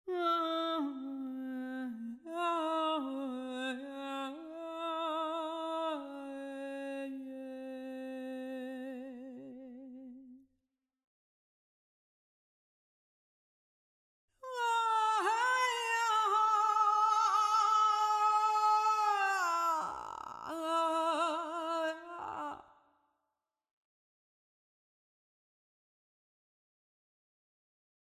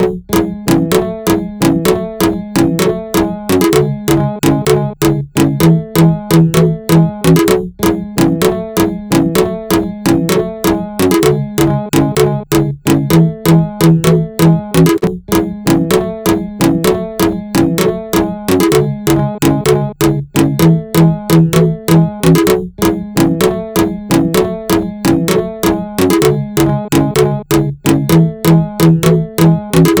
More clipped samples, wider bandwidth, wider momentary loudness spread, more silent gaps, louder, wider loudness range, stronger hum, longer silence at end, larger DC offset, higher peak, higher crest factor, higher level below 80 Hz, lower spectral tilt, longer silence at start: neither; second, 16 kHz vs over 20 kHz; first, 16 LU vs 5 LU; first, 11.04-14.28 s vs none; second, -33 LUFS vs -12 LUFS; first, 17 LU vs 2 LU; neither; first, 5.45 s vs 0 s; neither; second, -20 dBFS vs 0 dBFS; about the same, 16 dB vs 12 dB; second, -82 dBFS vs -34 dBFS; second, -1.5 dB/octave vs -6 dB/octave; about the same, 0.05 s vs 0 s